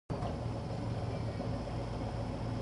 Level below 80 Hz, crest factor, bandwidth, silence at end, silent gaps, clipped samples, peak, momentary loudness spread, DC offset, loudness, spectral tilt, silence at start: -46 dBFS; 12 dB; 11.5 kHz; 0 s; none; under 0.1%; -24 dBFS; 1 LU; under 0.1%; -39 LUFS; -7.5 dB/octave; 0.1 s